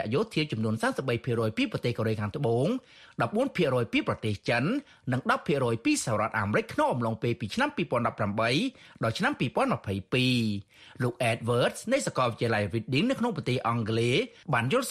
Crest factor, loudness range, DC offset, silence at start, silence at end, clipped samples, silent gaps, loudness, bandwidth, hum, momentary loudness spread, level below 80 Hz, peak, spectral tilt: 16 dB; 1 LU; under 0.1%; 0 s; 0 s; under 0.1%; none; -28 LUFS; 13.5 kHz; none; 5 LU; -60 dBFS; -12 dBFS; -5.5 dB/octave